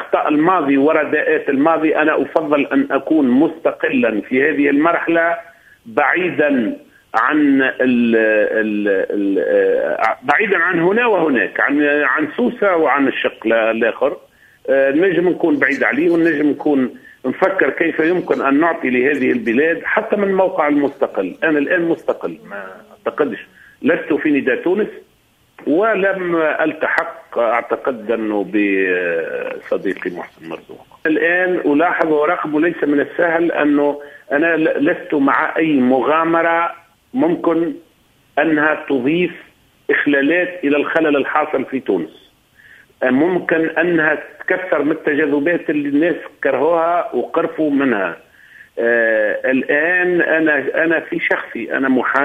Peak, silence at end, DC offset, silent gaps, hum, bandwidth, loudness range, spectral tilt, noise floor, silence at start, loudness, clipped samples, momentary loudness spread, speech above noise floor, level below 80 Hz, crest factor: 0 dBFS; 0 s; under 0.1%; none; none; 6.4 kHz; 3 LU; -7.5 dB/octave; -56 dBFS; 0 s; -16 LUFS; under 0.1%; 8 LU; 40 dB; -60 dBFS; 16 dB